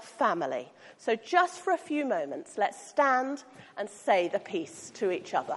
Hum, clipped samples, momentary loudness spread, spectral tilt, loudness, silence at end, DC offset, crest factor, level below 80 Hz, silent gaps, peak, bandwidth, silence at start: none; under 0.1%; 13 LU; -3.5 dB/octave; -30 LUFS; 0 s; under 0.1%; 20 dB; -84 dBFS; none; -10 dBFS; 11.5 kHz; 0 s